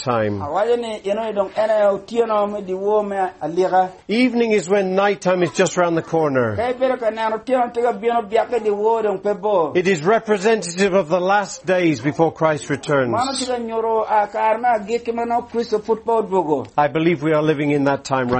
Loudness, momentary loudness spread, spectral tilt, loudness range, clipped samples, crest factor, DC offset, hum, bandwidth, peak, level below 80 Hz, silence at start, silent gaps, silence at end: -19 LUFS; 5 LU; -5.5 dB/octave; 2 LU; under 0.1%; 16 dB; under 0.1%; none; 8.8 kHz; -2 dBFS; -56 dBFS; 0 s; none; 0 s